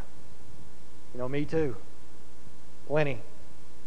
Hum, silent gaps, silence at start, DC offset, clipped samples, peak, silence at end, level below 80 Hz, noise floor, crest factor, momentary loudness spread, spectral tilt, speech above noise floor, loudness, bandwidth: none; none; 0 s; 6%; under 0.1%; -14 dBFS; 0 s; -56 dBFS; -53 dBFS; 22 dB; 24 LU; -7 dB/octave; 23 dB; -32 LUFS; 11 kHz